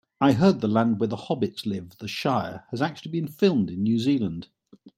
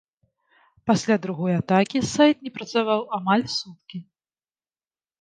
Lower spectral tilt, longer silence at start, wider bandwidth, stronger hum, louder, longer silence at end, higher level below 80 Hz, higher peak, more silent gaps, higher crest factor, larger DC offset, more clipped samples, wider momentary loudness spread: first, -7 dB/octave vs -5.5 dB/octave; second, 0.2 s vs 0.85 s; first, 16 kHz vs 9.8 kHz; neither; about the same, -25 LUFS vs -23 LUFS; second, 0.1 s vs 1.2 s; about the same, -62 dBFS vs -62 dBFS; about the same, -6 dBFS vs -4 dBFS; neither; about the same, 18 dB vs 20 dB; neither; neither; second, 11 LU vs 16 LU